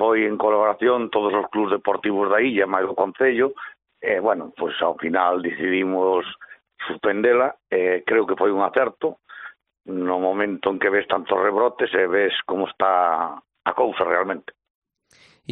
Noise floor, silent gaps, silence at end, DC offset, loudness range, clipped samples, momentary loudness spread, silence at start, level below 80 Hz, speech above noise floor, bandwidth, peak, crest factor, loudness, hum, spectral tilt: -57 dBFS; 14.70-14.82 s; 0 s; under 0.1%; 2 LU; under 0.1%; 10 LU; 0 s; -66 dBFS; 36 dB; 4.2 kHz; -2 dBFS; 18 dB; -21 LUFS; none; -2 dB/octave